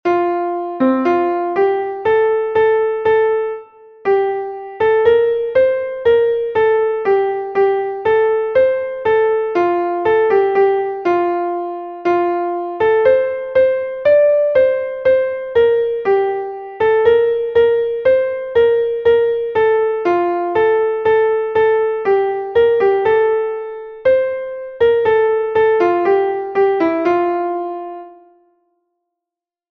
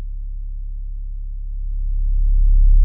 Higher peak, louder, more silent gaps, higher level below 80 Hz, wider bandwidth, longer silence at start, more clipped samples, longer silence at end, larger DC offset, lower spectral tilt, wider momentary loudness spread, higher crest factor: first, -2 dBFS vs -6 dBFS; first, -15 LUFS vs -25 LUFS; neither; second, -52 dBFS vs -16 dBFS; first, 5.2 kHz vs 0.3 kHz; about the same, 0.05 s vs 0 s; neither; first, 1.55 s vs 0 s; neither; second, -7 dB/octave vs -22 dB/octave; second, 7 LU vs 14 LU; about the same, 14 dB vs 12 dB